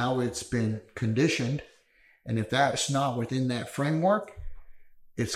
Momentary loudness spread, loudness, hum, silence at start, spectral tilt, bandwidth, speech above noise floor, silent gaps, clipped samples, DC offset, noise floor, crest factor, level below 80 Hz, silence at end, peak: 10 LU; -28 LUFS; none; 0 s; -5 dB/octave; 14.5 kHz; 35 dB; none; under 0.1%; under 0.1%; -63 dBFS; 18 dB; -52 dBFS; 0 s; -12 dBFS